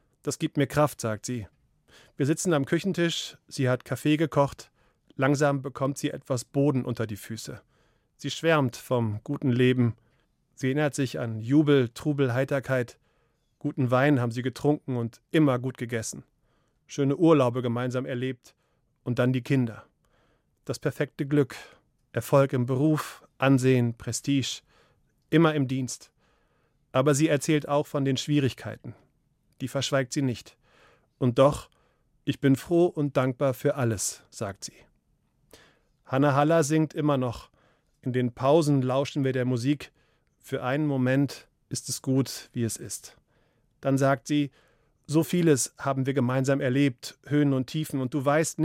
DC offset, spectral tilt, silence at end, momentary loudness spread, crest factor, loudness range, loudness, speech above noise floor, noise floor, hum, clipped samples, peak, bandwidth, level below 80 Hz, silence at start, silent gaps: under 0.1%; -6 dB/octave; 0 s; 14 LU; 18 dB; 4 LU; -26 LUFS; 45 dB; -71 dBFS; none; under 0.1%; -8 dBFS; 16 kHz; -62 dBFS; 0.25 s; none